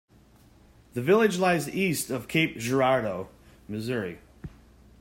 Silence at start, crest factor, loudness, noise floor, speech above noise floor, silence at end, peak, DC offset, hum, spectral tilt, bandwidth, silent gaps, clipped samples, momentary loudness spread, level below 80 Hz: 0.95 s; 18 dB; -26 LUFS; -57 dBFS; 31 dB; 0.5 s; -8 dBFS; under 0.1%; none; -5 dB/octave; 16.5 kHz; none; under 0.1%; 22 LU; -58 dBFS